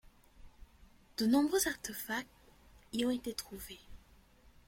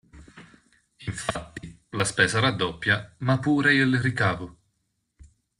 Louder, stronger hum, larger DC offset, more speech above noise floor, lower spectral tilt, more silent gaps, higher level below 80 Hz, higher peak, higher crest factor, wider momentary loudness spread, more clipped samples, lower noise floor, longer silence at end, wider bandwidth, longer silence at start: second, -35 LUFS vs -24 LUFS; neither; neither; second, 28 dB vs 52 dB; second, -3 dB/octave vs -4.5 dB/octave; neither; second, -62 dBFS vs -54 dBFS; second, -18 dBFS vs -6 dBFS; about the same, 20 dB vs 20 dB; about the same, 19 LU vs 17 LU; neither; second, -63 dBFS vs -75 dBFS; first, 0.7 s vs 0.35 s; first, 16.5 kHz vs 11.5 kHz; about the same, 0.05 s vs 0.15 s